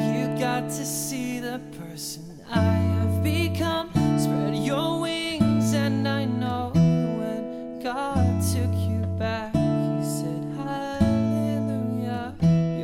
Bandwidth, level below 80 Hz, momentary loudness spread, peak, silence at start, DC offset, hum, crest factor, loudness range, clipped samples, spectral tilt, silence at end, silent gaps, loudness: 17 kHz; -46 dBFS; 9 LU; -8 dBFS; 0 s; under 0.1%; none; 16 dB; 2 LU; under 0.1%; -6 dB/octave; 0 s; none; -25 LUFS